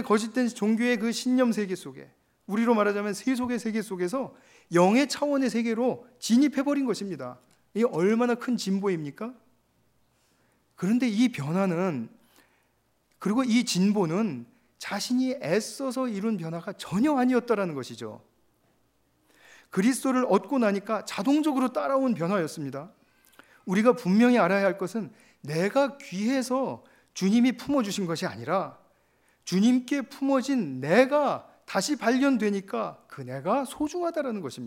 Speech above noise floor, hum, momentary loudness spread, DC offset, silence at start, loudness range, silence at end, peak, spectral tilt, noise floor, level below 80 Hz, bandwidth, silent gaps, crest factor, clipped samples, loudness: 44 dB; none; 13 LU; under 0.1%; 0 s; 4 LU; 0 s; -6 dBFS; -5.5 dB/octave; -69 dBFS; -72 dBFS; 16 kHz; none; 20 dB; under 0.1%; -26 LUFS